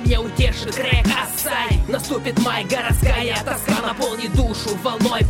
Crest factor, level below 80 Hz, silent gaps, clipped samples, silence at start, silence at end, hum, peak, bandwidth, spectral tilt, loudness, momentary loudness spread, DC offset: 16 dB; -24 dBFS; none; under 0.1%; 0 s; 0 s; none; -4 dBFS; 17 kHz; -4.5 dB/octave; -20 LUFS; 4 LU; under 0.1%